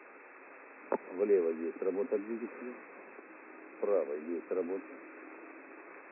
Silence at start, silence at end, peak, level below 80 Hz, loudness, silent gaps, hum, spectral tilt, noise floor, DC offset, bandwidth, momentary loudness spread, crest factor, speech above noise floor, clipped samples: 0 s; 0 s; -18 dBFS; under -90 dBFS; -35 LUFS; none; none; -1 dB/octave; -54 dBFS; under 0.1%; 2.8 kHz; 21 LU; 18 dB; 20 dB; under 0.1%